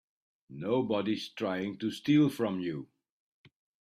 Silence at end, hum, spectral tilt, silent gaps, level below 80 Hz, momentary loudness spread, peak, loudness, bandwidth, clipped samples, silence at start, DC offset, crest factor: 0.95 s; none; -7 dB/octave; none; -74 dBFS; 13 LU; -14 dBFS; -31 LUFS; 13.5 kHz; under 0.1%; 0.5 s; under 0.1%; 18 dB